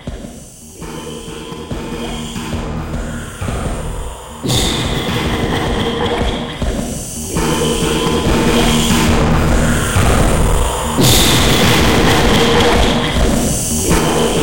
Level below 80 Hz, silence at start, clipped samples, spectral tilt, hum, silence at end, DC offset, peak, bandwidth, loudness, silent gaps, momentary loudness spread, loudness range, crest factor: -22 dBFS; 0 s; under 0.1%; -4 dB/octave; none; 0 s; 2%; 0 dBFS; 17 kHz; -14 LUFS; none; 16 LU; 12 LU; 14 dB